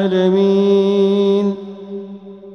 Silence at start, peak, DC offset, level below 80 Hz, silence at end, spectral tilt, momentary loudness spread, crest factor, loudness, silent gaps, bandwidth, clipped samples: 0 s; -4 dBFS; under 0.1%; -64 dBFS; 0 s; -8 dB/octave; 17 LU; 12 dB; -14 LUFS; none; 6.4 kHz; under 0.1%